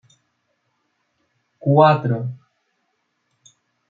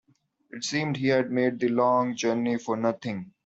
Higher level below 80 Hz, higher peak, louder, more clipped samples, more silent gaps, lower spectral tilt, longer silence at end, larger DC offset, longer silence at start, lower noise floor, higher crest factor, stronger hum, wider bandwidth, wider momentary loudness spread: about the same, -68 dBFS vs -70 dBFS; first, -2 dBFS vs -10 dBFS; first, -18 LUFS vs -26 LUFS; neither; neither; first, -8.5 dB/octave vs -5.5 dB/octave; first, 1.55 s vs 0.15 s; neither; first, 1.65 s vs 0.55 s; first, -71 dBFS vs -65 dBFS; first, 22 dB vs 16 dB; neither; second, 7.2 kHz vs 8 kHz; first, 18 LU vs 11 LU